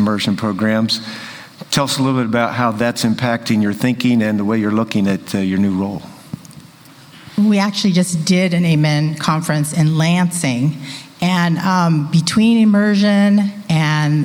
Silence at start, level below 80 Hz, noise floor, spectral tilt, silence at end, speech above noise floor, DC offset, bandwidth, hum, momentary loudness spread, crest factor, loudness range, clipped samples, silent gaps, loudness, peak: 0 s; -54 dBFS; -42 dBFS; -5.5 dB/octave; 0 s; 27 dB; under 0.1%; over 20 kHz; none; 8 LU; 16 dB; 4 LU; under 0.1%; none; -16 LUFS; 0 dBFS